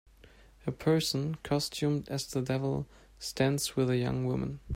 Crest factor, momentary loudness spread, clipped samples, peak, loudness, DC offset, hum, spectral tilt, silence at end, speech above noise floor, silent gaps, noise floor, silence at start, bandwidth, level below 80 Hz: 18 dB; 11 LU; under 0.1%; -14 dBFS; -32 LUFS; under 0.1%; none; -5.5 dB/octave; 0 s; 26 dB; none; -57 dBFS; 0.65 s; 16 kHz; -54 dBFS